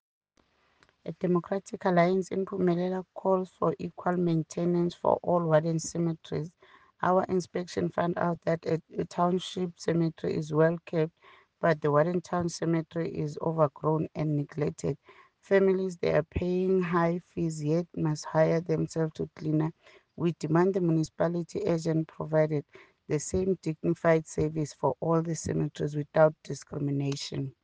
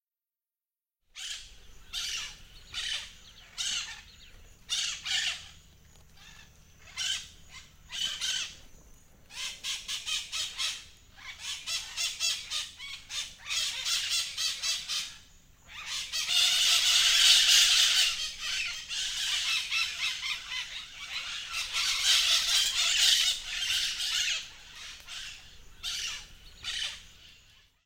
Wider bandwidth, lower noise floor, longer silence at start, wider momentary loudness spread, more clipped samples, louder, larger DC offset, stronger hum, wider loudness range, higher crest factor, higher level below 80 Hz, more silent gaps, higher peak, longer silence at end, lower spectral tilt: second, 9.6 kHz vs 16.5 kHz; second, -69 dBFS vs under -90 dBFS; about the same, 1.05 s vs 1.15 s; second, 8 LU vs 20 LU; neither; about the same, -29 LUFS vs -27 LUFS; neither; neither; second, 2 LU vs 14 LU; about the same, 20 dB vs 24 dB; about the same, -58 dBFS vs -58 dBFS; neither; about the same, -8 dBFS vs -6 dBFS; second, 0.1 s vs 0.55 s; first, -7 dB/octave vs 3 dB/octave